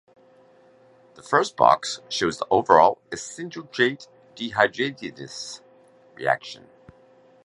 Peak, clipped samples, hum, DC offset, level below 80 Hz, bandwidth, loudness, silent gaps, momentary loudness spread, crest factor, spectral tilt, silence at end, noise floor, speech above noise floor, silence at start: -2 dBFS; under 0.1%; none; under 0.1%; -62 dBFS; 11.5 kHz; -22 LUFS; none; 19 LU; 24 dB; -3.5 dB/octave; 0.9 s; -55 dBFS; 32 dB; 1.25 s